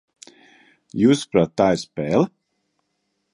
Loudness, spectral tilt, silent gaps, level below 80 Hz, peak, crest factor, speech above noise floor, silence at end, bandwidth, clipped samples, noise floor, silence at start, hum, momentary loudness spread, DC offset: -20 LUFS; -6 dB/octave; none; -54 dBFS; -2 dBFS; 20 dB; 55 dB; 1.05 s; 11.5 kHz; under 0.1%; -73 dBFS; 0.95 s; none; 7 LU; under 0.1%